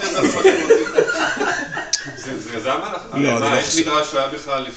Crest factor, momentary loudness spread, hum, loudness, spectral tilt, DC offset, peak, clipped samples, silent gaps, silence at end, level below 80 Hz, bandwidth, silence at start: 18 dB; 10 LU; none; -18 LUFS; -3 dB/octave; under 0.1%; -2 dBFS; under 0.1%; none; 0 s; -52 dBFS; 9 kHz; 0 s